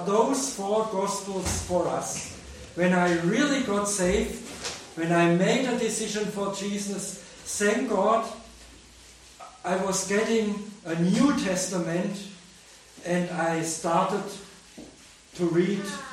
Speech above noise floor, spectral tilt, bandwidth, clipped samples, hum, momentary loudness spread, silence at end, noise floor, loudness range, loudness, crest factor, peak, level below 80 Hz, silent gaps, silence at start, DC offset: 25 dB; -4.5 dB/octave; 16 kHz; under 0.1%; none; 16 LU; 0 s; -51 dBFS; 4 LU; -26 LUFS; 18 dB; -10 dBFS; -52 dBFS; none; 0 s; under 0.1%